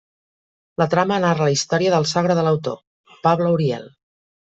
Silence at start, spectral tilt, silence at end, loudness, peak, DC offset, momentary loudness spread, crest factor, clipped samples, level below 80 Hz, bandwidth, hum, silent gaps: 0.8 s; -5.5 dB/octave; 0.55 s; -19 LUFS; -2 dBFS; under 0.1%; 11 LU; 18 dB; under 0.1%; -60 dBFS; 8 kHz; none; 2.87-3.04 s